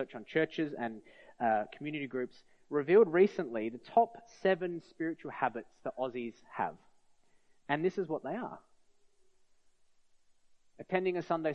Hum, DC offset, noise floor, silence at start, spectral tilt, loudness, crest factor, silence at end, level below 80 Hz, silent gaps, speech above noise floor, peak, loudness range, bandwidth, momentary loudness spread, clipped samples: none; under 0.1%; -66 dBFS; 0 s; -7.5 dB/octave; -34 LUFS; 20 dB; 0 s; -80 dBFS; none; 32 dB; -14 dBFS; 9 LU; 6.8 kHz; 14 LU; under 0.1%